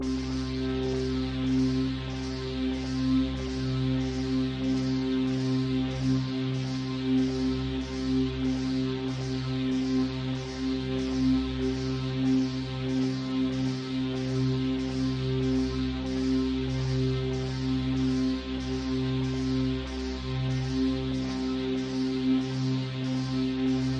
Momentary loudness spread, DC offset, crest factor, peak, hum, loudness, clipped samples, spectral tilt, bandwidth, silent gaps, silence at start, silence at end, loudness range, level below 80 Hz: 5 LU; under 0.1%; 12 dB; -16 dBFS; none; -29 LUFS; under 0.1%; -7 dB/octave; 8.8 kHz; none; 0 s; 0 s; 1 LU; -42 dBFS